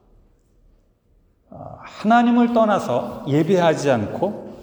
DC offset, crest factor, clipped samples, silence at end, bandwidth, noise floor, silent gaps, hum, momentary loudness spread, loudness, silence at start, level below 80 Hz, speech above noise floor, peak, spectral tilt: under 0.1%; 16 dB; under 0.1%; 0 s; over 20 kHz; -59 dBFS; none; none; 21 LU; -19 LUFS; 1.55 s; -56 dBFS; 41 dB; -4 dBFS; -6.5 dB/octave